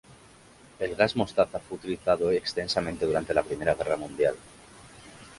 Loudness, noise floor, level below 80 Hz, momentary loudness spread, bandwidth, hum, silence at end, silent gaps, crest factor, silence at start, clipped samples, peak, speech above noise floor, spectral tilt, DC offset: -27 LUFS; -54 dBFS; -54 dBFS; 11 LU; 11.5 kHz; none; 0.05 s; none; 22 dB; 0.1 s; under 0.1%; -6 dBFS; 27 dB; -5 dB/octave; under 0.1%